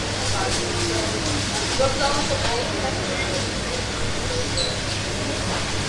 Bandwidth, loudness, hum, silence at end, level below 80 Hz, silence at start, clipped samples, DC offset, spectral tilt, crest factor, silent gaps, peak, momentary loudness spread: 11.5 kHz; -23 LUFS; none; 0 s; -36 dBFS; 0 s; under 0.1%; under 0.1%; -3 dB/octave; 16 dB; none; -8 dBFS; 4 LU